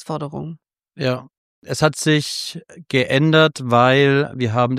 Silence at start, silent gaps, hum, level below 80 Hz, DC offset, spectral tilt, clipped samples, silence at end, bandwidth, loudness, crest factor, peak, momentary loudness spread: 0 s; 1.38-1.62 s; none; -56 dBFS; under 0.1%; -5 dB/octave; under 0.1%; 0 s; 15 kHz; -18 LUFS; 18 dB; -2 dBFS; 16 LU